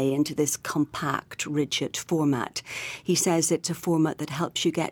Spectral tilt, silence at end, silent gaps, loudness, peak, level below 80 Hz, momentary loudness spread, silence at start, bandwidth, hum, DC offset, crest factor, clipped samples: -4 dB/octave; 0 s; none; -26 LUFS; -10 dBFS; -64 dBFS; 7 LU; 0 s; 19 kHz; none; under 0.1%; 16 dB; under 0.1%